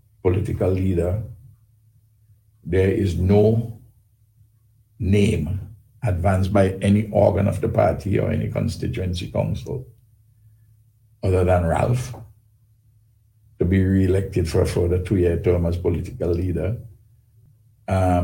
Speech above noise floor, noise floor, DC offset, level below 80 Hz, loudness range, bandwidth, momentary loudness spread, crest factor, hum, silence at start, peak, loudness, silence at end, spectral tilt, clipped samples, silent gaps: 38 dB; -58 dBFS; under 0.1%; -40 dBFS; 5 LU; 17 kHz; 11 LU; 20 dB; none; 0.25 s; -2 dBFS; -21 LUFS; 0 s; -8 dB/octave; under 0.1%; none